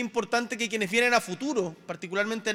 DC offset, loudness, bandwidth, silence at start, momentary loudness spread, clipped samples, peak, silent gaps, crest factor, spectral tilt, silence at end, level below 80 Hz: under 0.1%; -27 LUFS; 16.5 kHz; 0 s; 9 LU; under 0.1%; -8 dBFS; none; 20 dB; -3 dB/octave; 0 s; -70 dBFS